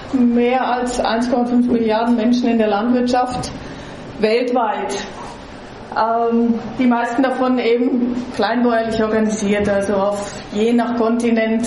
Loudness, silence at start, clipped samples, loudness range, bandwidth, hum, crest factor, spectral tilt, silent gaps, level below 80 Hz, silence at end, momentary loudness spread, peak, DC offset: -17 LUFS; 0 s; under 0.1%; 3 LU; 11.5 kHz; none; 16 dB; -5.5 dB/octave; none; -44 dBFS; 0 s; 10 LU; -2 dBFS; under 0.1%